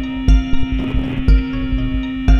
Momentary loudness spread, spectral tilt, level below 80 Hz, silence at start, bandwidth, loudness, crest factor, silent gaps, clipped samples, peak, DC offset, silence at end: 5 LU; -7.5 dB/octave; -16 dBFS; 0 s; 6.6 kHz; -19 LUFS; 12 dB; none; under 0.1%; -2 dBFS; under 0.1%; 0 s